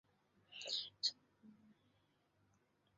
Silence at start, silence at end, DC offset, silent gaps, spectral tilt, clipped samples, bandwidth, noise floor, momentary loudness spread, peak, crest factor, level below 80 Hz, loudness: 0.5 s; 1.25 s; under 0.1%; none; 1 dB/octave; under 0.1%; 7.4 kHz; -79 dBFS; 18 LU; -26 dBFS; 26 dB; under -90 dBFS; -42 LUFS